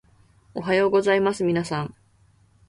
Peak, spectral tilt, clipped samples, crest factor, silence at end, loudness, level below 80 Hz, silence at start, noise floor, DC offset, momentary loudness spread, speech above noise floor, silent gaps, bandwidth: -8 dBFS; -6 dB/octave; under 0.1%; 16 dB; 0.75 s; -22 LUFS; -60 dBFS; 0.55 s; -59 dBFS; under 0.1%; 15 LU; 37 dB; none; 11.5 kHz